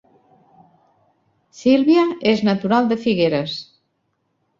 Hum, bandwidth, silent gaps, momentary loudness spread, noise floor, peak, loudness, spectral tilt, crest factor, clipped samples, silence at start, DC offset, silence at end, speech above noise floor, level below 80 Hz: none; 7.6 kHz; none; 9 LU; -70 dBFS; -4 dBFS; -18 LUFS; -6.5 dB/octave; 16 dB; under 0.1%; 1.55 s; under 0.1%; 0.95 s; 53 dB; -60 dBFS